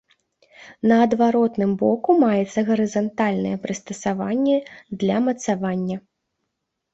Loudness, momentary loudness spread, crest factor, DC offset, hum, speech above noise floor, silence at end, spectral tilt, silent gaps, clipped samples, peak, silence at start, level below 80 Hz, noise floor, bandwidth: -21 LUFS; 9 LU; 16 dB; under 0.1%; none; 58 dB; 0.95 s; -6.5 dB/octave; none; under 0.1%; -4 dBFS; 0.6 s; -62 dBFS; -78 dBFS; 8 kHz